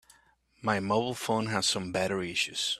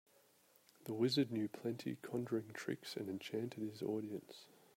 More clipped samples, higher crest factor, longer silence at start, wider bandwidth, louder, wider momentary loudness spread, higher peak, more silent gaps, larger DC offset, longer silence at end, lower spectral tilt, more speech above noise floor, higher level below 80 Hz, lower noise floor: neither; about the same, 20 dB vs 20 dB; second, 0.6 s vs 0.8 s; about the same, 15 kHz vs 16 kHz; first, -29 LUFS vs -42 LUFS; second, 3 LU vs 12 LU; first, -10 dBFS vs -24 dBFS; neither; neither; second, 0 s vs 0.3 s; second, -3.5 dB/octave vs -6 dB/octave; first, 35 dB vs 30 dB; first, -64 dBFS vs -84 dBFS; second, -65 dBFS vs -71 dBFS